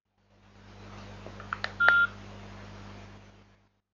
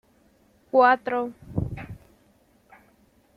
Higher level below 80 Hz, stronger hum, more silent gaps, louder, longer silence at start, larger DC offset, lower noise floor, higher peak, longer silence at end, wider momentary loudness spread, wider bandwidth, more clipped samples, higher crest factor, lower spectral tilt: second, -56 dBFS vs -50 dBFS; first, 50 Hz at -50 dBFS vs none; neither; second, -26 LUFS vs -23 LUFS; about the same, 0.85 s vs 0.75 s; neither; about the same, -63 dBFS vs -61 dBFS; first, -2 dBFS vs -6 dBFS; second, 0.95 s vs 1.4 s; first, 26 LU vs 22 LU; first, 7.4 kHz vs 5.2 kHz; neither; first, 30 dB vs 22 dB; second, -4.5 dB/octave vs -8 dB/octave